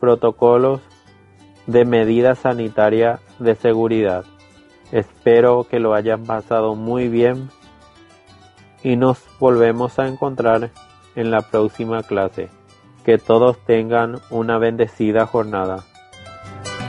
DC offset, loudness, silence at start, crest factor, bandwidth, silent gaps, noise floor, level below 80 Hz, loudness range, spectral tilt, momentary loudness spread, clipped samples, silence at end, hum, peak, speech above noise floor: under 0.1%; -17 LUFS; 0 s; 16 dB; 10.5 kHz; none; -48 dBFS; -54 dBFS; 4 LU; -7.5 dB/octave; 12 LU; under 0.1%; 0 s; none; -2 dBFS; 32 dB